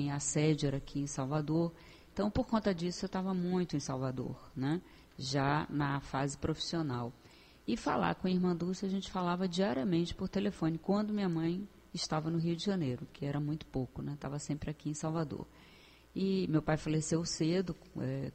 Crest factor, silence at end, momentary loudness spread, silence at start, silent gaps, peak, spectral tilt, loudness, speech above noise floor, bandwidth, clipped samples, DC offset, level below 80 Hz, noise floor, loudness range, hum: 18 dB; 0 s; 8 LU; 0 s; none; -18 dBFS; -5.5 dB/octave; -35 LUFS; 25 dB; 8.8 kHz; under 0.1%; under 0.1%; -56 dBFS; -59 dBFS; 3 LU; none